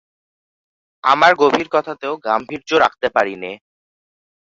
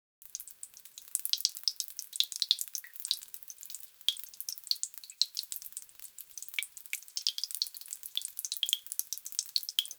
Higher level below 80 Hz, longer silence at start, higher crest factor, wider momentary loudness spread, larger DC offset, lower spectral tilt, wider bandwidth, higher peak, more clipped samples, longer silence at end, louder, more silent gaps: first, -60 dBFS vs -86 dBFS; first, 1.05 s vs 0.25 s; second, 18 dB vs 32 dB; about the same, 14 LU vs 14 LU; neither; first, -4 dB/octave vs 6 dB/octave; second, 7.8 kHz vs over 20 kHz; first, 0 dBFS vs -6 dBFS; neither; first, 0.95 s vs 0 s; first, -16 LUFS vs -34 LUFS; neither